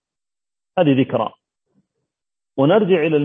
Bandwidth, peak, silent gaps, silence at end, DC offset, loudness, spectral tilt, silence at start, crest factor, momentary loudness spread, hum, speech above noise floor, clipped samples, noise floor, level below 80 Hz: 3.8 kHz; -2 dBFS; none; 0 s; under 0.1%; -18 LUFS; -10 dB/octave; 0.75 s; 16 dB; 12 LU; none; over 74 dB; under 0.1%; under -90 dBFS; -66 dBFS